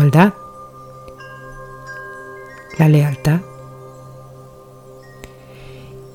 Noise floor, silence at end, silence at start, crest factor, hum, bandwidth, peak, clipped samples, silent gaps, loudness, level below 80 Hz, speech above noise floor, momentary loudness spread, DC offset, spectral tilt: -40 dBFS; 0.15 s; 0 s; 20 dB; none; 15.5 kHz; 0 dBFS; under 0.1%; none; -15 LUFS; -46 dBFS; 28 dB; 26 LU; under 0.1%; -8 dB/octave